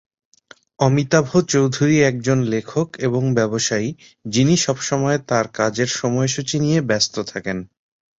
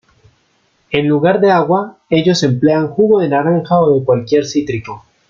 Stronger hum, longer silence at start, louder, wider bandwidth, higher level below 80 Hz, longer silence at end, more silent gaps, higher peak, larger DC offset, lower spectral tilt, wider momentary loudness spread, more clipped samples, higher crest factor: neither; about the same, 0.8 s vs 0.9 s; second, -19 LUFS vs -13 LUFS; about the same, 8 kHz vs 7.4 kHz; about the same, -54 dBFS vs -52 dBFS; first, 0.55 s vs 0.3 s; neither; about the same, -2 dBFS vs -2 dBFS; neither; second, -5 dB/octave vs -6.5 dB/octave; about the same, 8 LU vs 7 LU; neither; first, 18 dB vs 12 dB